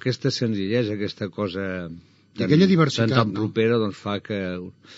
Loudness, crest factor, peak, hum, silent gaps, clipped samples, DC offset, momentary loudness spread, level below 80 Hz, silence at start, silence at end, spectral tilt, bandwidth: -23 LUFS; 20 dB; -4 dBFS; none; none; under 0.1%; under 0.1%; 12 LU; -64 dBFS; 0.05 s; 0 s; -5.5 dB/octave; 7.6 kHz